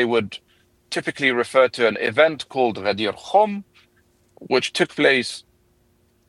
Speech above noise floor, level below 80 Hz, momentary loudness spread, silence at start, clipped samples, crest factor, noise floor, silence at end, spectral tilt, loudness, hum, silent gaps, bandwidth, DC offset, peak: 41 dB; -66 dBFS; 12 LU; 0 s; under 0.1%; 20 dB; -61 dBFS; 0.9 s; -4 dB/octave; -20 LUFS; none; none; 12.5 kHz; under 0.1%; -2 dBFS